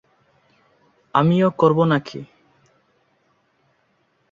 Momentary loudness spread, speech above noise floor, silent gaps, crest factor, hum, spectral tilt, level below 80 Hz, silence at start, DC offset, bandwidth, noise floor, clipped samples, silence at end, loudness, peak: 16 LU; 48 dB; none; 22 dB; none; -8.5 dB/octave; -62 dBFS; 1.15 s; under 0.1%; 7.4 kHz; -65 dBFS; under 0.1%; 2.1 s; -18 LUFS; -2 dBFS